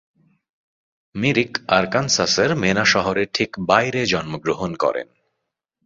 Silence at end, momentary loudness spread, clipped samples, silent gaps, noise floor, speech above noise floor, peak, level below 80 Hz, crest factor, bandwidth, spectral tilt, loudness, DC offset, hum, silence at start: 0.8 s; 8 LU; under 0.1%; none; -79 dBFS; 59 dB; 0 dBFS; -52 dBFS; 22 dB; 7.8 kHz; -3.5 dB/octave; -19 LUFS; under 0.1%; none; 1.15 s